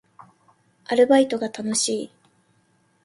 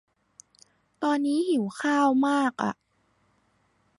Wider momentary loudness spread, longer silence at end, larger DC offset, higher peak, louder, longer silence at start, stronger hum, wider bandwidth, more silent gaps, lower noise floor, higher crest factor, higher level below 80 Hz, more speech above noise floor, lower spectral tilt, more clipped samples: first, 12 LU vs 9 LU; second, 1 s vs 1.25 s; neither; first, -6 dBFS vs -10 dBFS; first, -21 LUFS vs -25 LUFS; about the same, 0.9 s vs 1 s; neither; about the same, 11.5 kHz vs 11.5 kHz; neither; second, -64 dBFS vs -68 dBFS; about the same, 18 dB vs 16 dB; first, -70 dBFS vs -76 dBFS; about the same, 44 dB vs 44 dB; second, -3 dB/octave vs -5 dB/octave; neither